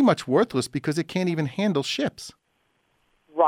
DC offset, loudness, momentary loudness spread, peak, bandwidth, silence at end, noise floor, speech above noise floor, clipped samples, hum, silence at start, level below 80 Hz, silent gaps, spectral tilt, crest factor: under 0.1%; -25 LUFS; 12 LU; -6 dBFS; 16 kHz; 0 s; -70 dBFS; 46 dB; under 0.1%; none; 0 s; -64 dBFS; none; -5.5 dB/octave; 18 dB